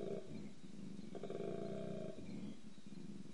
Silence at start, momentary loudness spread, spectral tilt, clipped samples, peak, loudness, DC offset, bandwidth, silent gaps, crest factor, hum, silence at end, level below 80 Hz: 0 s; 9 LU; -7 dB/octave; under 0.1%; -32 dBFS; -50 LUFS; 0.3%; 11 kHz; none; 16 dB; none; 0 s; -78 dBFS